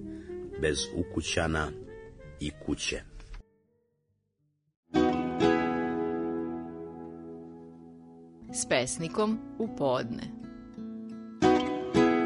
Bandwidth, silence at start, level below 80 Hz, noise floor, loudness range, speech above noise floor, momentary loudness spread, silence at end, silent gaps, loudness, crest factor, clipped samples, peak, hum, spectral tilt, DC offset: 10.5 kHz; 0 s; -50 dBFS; -76 dBFS; 5 LU; 45 dB; 22 LU; 0 s; 4.77-4.83 s; -30 LUFS; 22 dB; under 0.1%; -10 dBFS; none; -4.5 dB/octave; under 0.1%